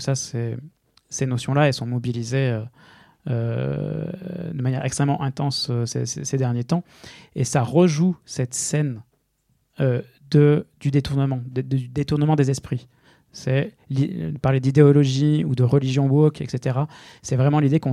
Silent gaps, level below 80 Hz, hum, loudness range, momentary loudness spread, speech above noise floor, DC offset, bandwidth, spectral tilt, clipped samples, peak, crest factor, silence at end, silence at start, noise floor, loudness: none; -54 dBFS; none; 6 LU; 12 LU; 47 dB; under 0.1%; 12 kHz; -6.5 dB/octave; under 0.1%; -2 dBFS; 20 dB; 0 s; 0 s; -67 dBFS; -22 LUFS